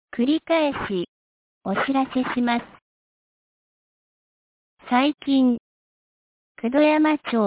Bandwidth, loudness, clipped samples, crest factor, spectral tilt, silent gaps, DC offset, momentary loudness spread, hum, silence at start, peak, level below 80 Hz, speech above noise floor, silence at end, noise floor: 4 kHz; -22 LUFS; under 0.1%; 18 dB; -9.5 dB/octave; 1.08-1.61 s, 2.82-4.77 s, 5.60-6.55 s; under 0.1%; 11 LU; none; 0.15 s; -6 dBFS; -60 dBFS; over 69 dB; 0 s; under -90 dBFS